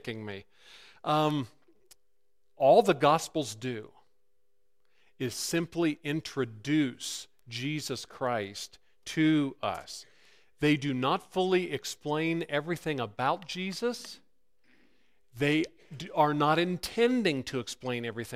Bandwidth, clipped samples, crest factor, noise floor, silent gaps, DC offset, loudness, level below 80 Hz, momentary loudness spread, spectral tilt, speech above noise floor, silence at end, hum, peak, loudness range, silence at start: 15.5 kHz; under 0.1%; 22 dB; -81 dBFS; none; under 0.1%; -30 LUFS; -66 dBFS; 14 LU; -5 dB/octave; 51 dB; 0 s; none; -10 dBFS; 5 LU; 0.05 s